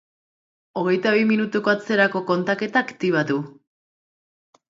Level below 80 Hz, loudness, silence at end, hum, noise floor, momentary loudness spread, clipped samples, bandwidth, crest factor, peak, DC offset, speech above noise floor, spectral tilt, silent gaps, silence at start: -72 dBFS; -21 LUFS; 1.2 s; none; under -90 dBFS; 8 LU; under 0.1%; 7.6 kHz; 20 dB; -2 dBFS; under 0.1%; over 69 dB; -6.5 dB/octave; none; 0.75 s